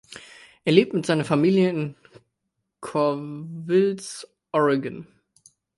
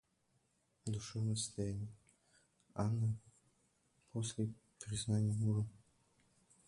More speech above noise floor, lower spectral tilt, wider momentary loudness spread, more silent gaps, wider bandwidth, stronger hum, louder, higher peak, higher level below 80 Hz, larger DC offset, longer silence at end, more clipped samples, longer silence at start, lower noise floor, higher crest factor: first, 57 dB vs 41 dB; about the same, -6.5 dB/octave vs -6 dB/octave; first, 19 LU vs 12 LU; neither; about the same, 11.5 kHz vs 11.5 kHz; neither; first, -23 LUFS vs -41 LUFS; first, -2 dBFS vs -24 dBFS; about the same, -70 dBFS vs -66 dBFS; neither; second, 0.75 s vs 0.9 s; neither; second, 0.1 s vs 0.85 s; about the same, -79 dBFS vs -79 dBFS; about the same, 22 dB vs 18 dB